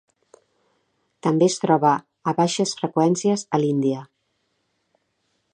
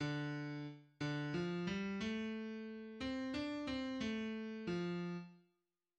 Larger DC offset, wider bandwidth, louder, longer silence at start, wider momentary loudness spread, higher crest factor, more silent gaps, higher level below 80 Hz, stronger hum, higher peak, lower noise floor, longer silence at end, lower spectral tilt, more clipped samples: neither; first, 11 kHz vs 9.2 kHz; first, -21 LUFS vs -43 LUFS; first, 1.25 s vs 0 s; about the same, 7 LU vs 7 LU; first, 20 dB vs 14 dB; neither; about the same, -72 dBFS vs -68 dBFS; neither; first, -4 dBFS vs -30 dBFS; second, -72 dBFS vs -87 dBFS; first, 1.5 s vs 0.6 s; about the same, -5.5 dB/octave vs -6.5 dB/octave; neither